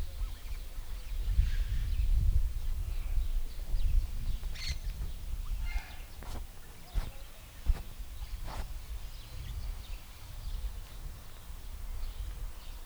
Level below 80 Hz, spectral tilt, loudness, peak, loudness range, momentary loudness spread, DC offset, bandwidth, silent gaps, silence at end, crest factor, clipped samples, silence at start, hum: -34 dBFS; -4.5 dB/octave; -40 LUFS; -14 dBFS; 9 LU; 14 LU; under 0.1%; over 20 kHz; none; 0 s; 20 dB; under 0.1%; 0 s; none